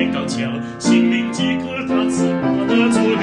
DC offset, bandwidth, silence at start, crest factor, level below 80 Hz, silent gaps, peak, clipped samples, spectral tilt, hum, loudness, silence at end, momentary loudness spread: under 0.1%; 11 kHz; 0 s; 14 dB; -54 dBFS; none; -4 dBFS; under 0.1%; -5 dB/octave; none; -18 LUFS; 0 s; 7 LU